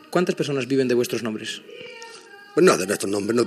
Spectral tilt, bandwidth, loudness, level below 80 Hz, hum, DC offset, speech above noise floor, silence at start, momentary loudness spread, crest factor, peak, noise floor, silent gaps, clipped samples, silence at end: -4.5 dB/octave; 14.5 kHz; -22 LUFS; -72 dBFS; none; under 0.1%; 22 dB; 0.1 s; 21 LU; 20 dB; -4 dBFS; -44 dBFS; none; under 0.1%; 0 s